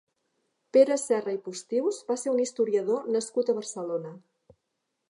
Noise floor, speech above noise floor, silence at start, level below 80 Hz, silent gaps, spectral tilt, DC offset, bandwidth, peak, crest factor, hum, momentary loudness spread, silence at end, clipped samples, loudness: -81 dBFS; 54 dB; 0.75 s; -82 dBFS; none; -4 dB/octave; under 0.1%; 11.5 kHz; -8 dBFS; 20 dB; none; 11 LU; 0.9 s; under 0.1%; -27 LUFS